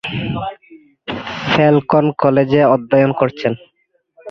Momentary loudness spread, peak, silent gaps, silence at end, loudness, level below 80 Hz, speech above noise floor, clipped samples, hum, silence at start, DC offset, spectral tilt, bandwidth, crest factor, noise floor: 15 LU; 0 dBFS; none; 0 s; -15 LUFS; -48 dBFS; 48 dB; under 0.1%; none; 0.05 s; under 0.1%; -8 dB/octave; 6.6 kHz; 16 dB; -62 dBFS